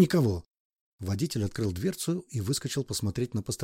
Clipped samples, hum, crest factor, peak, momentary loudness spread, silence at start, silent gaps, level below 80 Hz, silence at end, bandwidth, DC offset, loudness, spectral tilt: under 0.1%; none; 20 dB; -10 dBFS; 5 LU; 0 s; 0.50-0.54 s, 0.60-0.70 s, 0.81-0.98 s; -54 dBFS; 0 s; 16.5 kHz; under 0.1%; -31 LUFS; -5.5 dB/octave